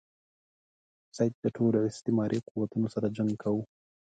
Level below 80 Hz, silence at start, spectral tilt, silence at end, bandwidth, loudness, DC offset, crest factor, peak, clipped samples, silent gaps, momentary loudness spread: -68 dBFS; 1.15 s; -8 dB/octave; 0.5 s; 9.2 kHz; -30 LUFS; under 0.1%; 18 dB; -14 dBFS; under 0.1%; 1.34-1.43 s, 2.51-2.55 s; 6 LU